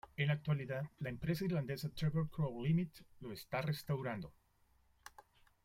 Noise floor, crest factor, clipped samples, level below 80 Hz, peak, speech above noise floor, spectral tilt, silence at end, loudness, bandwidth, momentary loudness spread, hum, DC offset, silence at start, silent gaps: -73 dBFS; 16 dB; under 0.1%; -64 dBFS; -24 dBFS; 34 dB; -7 dB/octave; 0.55 s; -40 LUFS; 16 kHz; 17 LU; none; under 0.1%; 0.05 s; none